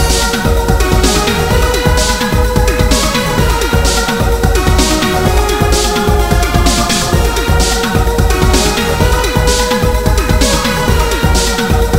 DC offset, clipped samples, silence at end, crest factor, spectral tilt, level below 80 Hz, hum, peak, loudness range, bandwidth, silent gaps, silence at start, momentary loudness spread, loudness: under 0.1%; under 0.1%; 0 s; 10 dB; -4 dB/octave; -14 dBFS; none; 0 dBFS; 0 LU; 16.5 kHz; none; 0 s; 2 LU; -12 LUFS